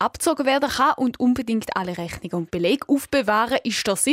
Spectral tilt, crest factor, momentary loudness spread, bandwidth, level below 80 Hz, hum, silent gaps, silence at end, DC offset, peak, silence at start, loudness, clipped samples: -3.5 dB/octave; 14 dB; 8 LU; 16 kHz; -52 dBFS; none; none; 0 s; under 0.1%; -8 dBFS; 0 s; -22 LUFS; under 0.1%